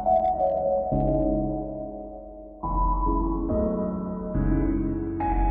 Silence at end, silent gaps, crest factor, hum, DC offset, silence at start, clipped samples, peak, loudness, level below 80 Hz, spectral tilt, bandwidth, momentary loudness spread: 0 s; none; 14 dB; none; under 0.1%; 0 s; under 0.1%; -12 dBFS; -26 LUFS; -32 dBFS; -10.5 dB/octave; 2.7 kHz; 11 LU